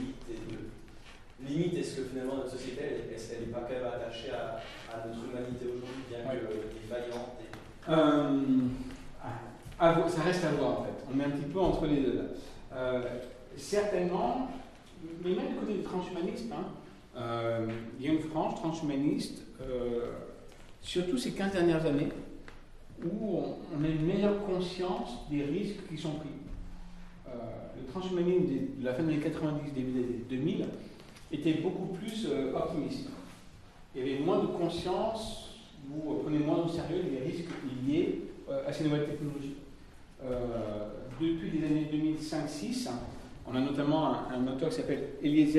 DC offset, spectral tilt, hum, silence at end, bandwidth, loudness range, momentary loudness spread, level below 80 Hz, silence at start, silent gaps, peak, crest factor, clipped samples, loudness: under 0.1%; -6.5 dB/octave; none; 0 s; 12.5 kHz; 7 LU; 16 LU; -52 dBFS; 0 s; none; -12 dBFS; 22 dB; under 0.1%; -33 LUFS